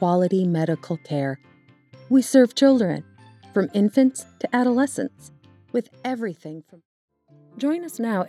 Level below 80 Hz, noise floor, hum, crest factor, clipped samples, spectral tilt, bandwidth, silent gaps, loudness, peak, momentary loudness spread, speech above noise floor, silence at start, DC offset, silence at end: -78 dBFS; -51 dBFS; none; 20 dB; under 0.1%; -6 dB/octave; 13.5 kHz; 6.85-7.08 s; -22 LUFS; -2 dBFS; 14 LU; 30 dB; 0 s; under 0.1%; 0 s